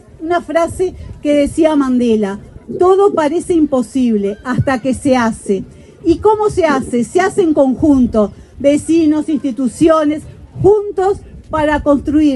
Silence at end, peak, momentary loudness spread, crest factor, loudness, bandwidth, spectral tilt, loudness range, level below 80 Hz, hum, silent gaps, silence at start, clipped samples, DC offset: 0 s; 0 dBFS; 9 LU; 12 dB; -14 LUFS; 11.5 kHz; -6.5 dB/octave; 2 LU; -36 dBFS; none; none; 0.2 s; under 0.1%; under 0.1%